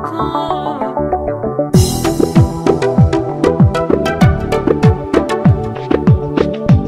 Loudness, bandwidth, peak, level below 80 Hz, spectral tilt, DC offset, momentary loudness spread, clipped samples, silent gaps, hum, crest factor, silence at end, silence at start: -14 LUFS; 16 kHz; 0 dBFS; -26 dBFS; -7 dB/octave; under 0.1%; 6 LU; under 0.1%; none; none; 12 dB; 0 s; 0 s